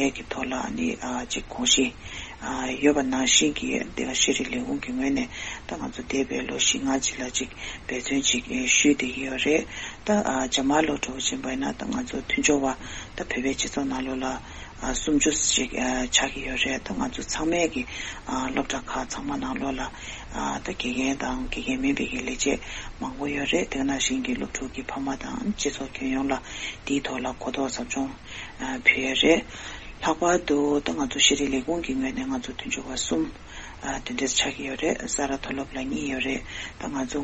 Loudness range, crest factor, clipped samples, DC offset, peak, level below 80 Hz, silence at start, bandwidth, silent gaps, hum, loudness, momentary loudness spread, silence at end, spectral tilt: 5 LU; 24 dB; under 0.1%; under 0.1%; -4 dBFS; -44 dBFS; 0 s; 8.4 kHz; none; none; -26 LUFS; 13 LU; 0 s; -2.5 dB/octave